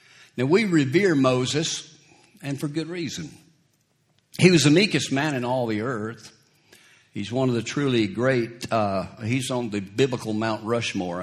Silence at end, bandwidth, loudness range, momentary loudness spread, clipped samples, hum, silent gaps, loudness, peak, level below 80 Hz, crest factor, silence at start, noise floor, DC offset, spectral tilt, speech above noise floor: 0 s; 14 kHz; 4 LU; 14 LU; under 0.1%; none; none; -23 LUFS; 0 dBFS; -62 dBFS; 24 dB; 0.35 s; -67 dBFS; under 0.1%; -5 dB/octave; 44 dB